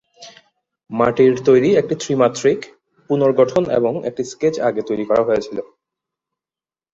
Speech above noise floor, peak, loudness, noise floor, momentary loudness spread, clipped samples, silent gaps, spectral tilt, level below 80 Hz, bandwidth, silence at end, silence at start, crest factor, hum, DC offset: over 74 dB; -2 dBFS; -17 LUFS; under -90 dBFS; 12 LU; under 0.1%; none; -6 dB/octave; -56 dBFS; 7.8 kHz; 1.3 s; 0.2 s; 16 dB; none; under 0.1%